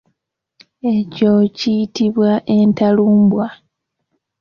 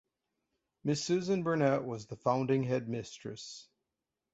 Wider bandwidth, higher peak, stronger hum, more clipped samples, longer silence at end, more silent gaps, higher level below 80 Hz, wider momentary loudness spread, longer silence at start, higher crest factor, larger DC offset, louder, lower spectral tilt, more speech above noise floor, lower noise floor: second, 6.8 kHz vs 8.2 kHz; first, -4 dBFS vs -16 dBFS; neither; neither; first, 0.85 s vs 0.7 s; neither; first, -56 dBFS vs -72 dBFS; second, 7 LU vs 14 LU; about the same, 0.85 s vs 0.85 s; second, 12 dB vs 18 dB; neither; first, -15 LUFS vs -33 LUFS; first, -7.5 dB/octave vs -6 dB/octave; about the same, 58 dB vs 56 dB; second, -72 dBFS vs -89 dBFS